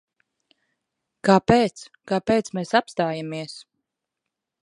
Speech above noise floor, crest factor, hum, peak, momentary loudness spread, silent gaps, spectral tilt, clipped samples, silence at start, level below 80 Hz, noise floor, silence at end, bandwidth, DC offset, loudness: 62 dB; 24 dB; none; -2 dBFS; 17 LU; none; -6 dB/octave; under 0.1%; 1.25 s; -54 dBFS; -84 dBFS; 1 s; 11 kHz; under 0.1%; -22 LUFS